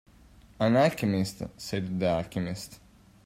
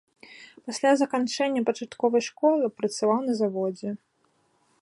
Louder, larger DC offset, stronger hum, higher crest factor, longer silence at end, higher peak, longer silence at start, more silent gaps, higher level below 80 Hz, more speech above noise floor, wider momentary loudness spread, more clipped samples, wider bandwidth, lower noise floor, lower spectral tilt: about the same, -28 LUFS vs -26 LUFS; neither; neither; about the same, 18 dB vs 16 dB; second, 0.5 s vs 0.85 s; about the same, -12 dBFS vs -10 dBFS; first, 0.6 s vs 0.3 s; neither; first, -58 dBFS vs -78 dBFS; second, 27 dB vs 43 dB; about the same, 14 LU vs 14 LU; neither; first, 16 kHz vs 11.5 kHz; second, -55 dBFS vs -68 dBFS; first, -6 dB/octave vs -4.5 dB/octave